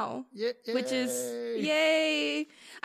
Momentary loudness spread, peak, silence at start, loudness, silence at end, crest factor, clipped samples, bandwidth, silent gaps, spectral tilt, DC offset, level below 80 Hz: 10 LU; -14 dBFS; 0 s; -29 LUFS; 0.05 s; 16 dB; under 0.1%; 15.5 kHz; none; -2.5 dB/octave; under 0.1%; -88 dBFS